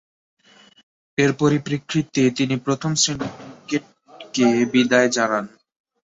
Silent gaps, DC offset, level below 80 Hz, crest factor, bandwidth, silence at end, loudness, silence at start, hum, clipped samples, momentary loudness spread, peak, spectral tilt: none; under 0.1%; -60 dBFS; 20 dB; 7.8 kHz; 0.55 s; -20 LUFS; 1.2 s; none; under 0.1%; 12 LU; -2 dBFS; -4.5 dB/octave